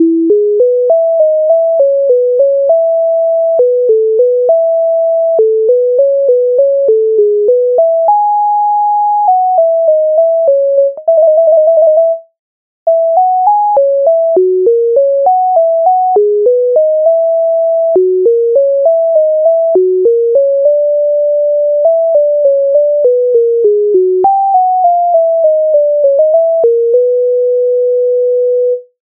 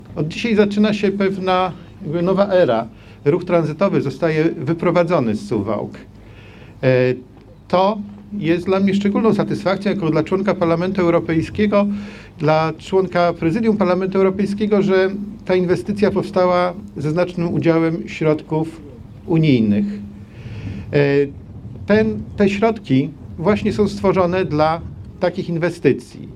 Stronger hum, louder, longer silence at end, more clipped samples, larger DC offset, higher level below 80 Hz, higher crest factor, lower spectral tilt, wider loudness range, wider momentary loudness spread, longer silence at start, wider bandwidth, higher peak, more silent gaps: neither; first, -9 LUFS vs -18 LUFS; first, 0.2 s vs 0 s; neither; neither; second, -68 dBFS vs -46 dBFS; second, 8 dB vs 18 dB; first, -10 dB/octave vs -7.5 dB/octave; about the same, 1 LU vs 2 LU; second, 2 LU vs 10 LU; about the same, 0 s vs 0 s; second, 1.3 kHz vs 10.5 kHz; about the same, 0 dBFS vs 0 dBFS; first, 12.39-12.86 s vs none